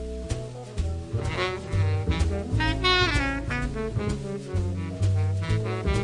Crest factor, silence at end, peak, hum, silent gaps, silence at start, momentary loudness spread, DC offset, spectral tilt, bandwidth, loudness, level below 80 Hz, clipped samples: 16 dB; 0 s; -10 dBFS; none; none; 0 s; 11 LU; under 0.1%; -5.5 dB/octave; 11 kHz; -27 LUFS; -34 dBFS; under 0.1%